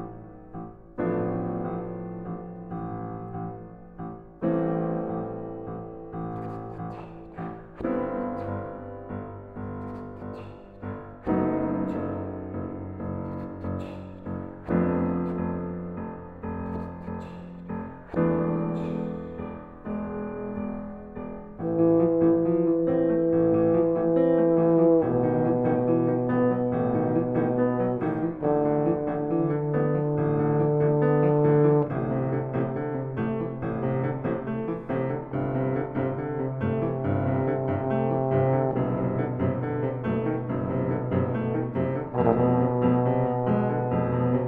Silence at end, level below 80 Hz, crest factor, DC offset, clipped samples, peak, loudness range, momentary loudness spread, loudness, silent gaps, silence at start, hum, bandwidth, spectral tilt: 0 s; -52 dBFS; 20 dB; under 0.1%; under 0.1%; -6 dBFS; 11 LU; 16 LU; -26 LUFS; none; 0 s; none; 4 kHz; -12 dB/octave